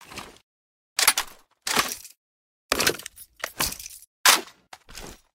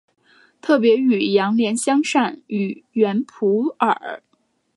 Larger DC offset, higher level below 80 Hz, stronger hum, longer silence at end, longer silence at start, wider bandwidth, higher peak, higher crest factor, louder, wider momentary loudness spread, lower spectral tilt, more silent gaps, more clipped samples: neither; first, -52 dBFS vs -74 dBFS; neither; second, 0.2 s vs 0.6 s; second, 0 s vs 0.65 s; first, 16.5 kHz vs 11.5 kHz; about the same, -4 dBFS vs -2 dBFS; first, 24 dB vs 18 dB; second, -23 LUFS vs -19 LUFS; first, 23 LU vs 9 LU; second, 0 dB/octave vs -5 dB/octave; first, 0.43-0.96 s, 2.17-2.69 s, 4.07-4.24 s vs none; neither